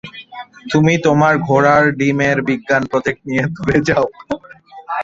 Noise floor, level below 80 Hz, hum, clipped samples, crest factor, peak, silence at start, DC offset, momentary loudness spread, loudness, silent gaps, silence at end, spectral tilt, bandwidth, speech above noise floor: -34 dBFS; -46 dBFS; none; under 0.1%; 14 dB; 0 dBFS; 0.05 s; under 0.1%; 15 LU; -15 LUFS; none; 0 s; -6.5 dB/octave; 7.8 kHz; 19 dB